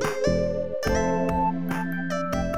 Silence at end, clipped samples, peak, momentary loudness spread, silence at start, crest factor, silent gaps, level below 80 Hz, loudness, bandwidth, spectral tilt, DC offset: 0 s; under 0.1%; -12 dBFS; 4 LU; 0 s; 14 dB; none; -38 dBFS; -26 LUFS; 16 kHz; -6 dB/octave; 1%